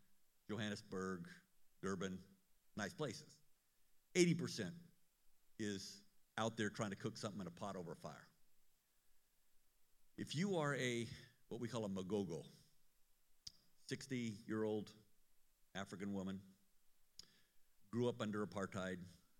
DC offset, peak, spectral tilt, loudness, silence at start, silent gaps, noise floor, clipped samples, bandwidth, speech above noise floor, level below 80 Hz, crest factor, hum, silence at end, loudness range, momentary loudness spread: under 0.1%; -20 dBFS; -5 dB/octave; -46 LUFS; 0 s; none; -73 dBFS; under 0.1%; 16.5 kHz; 28 dB; -82 dBFS; 26 dB; none; 0.25 s; 6 LU; 18 LU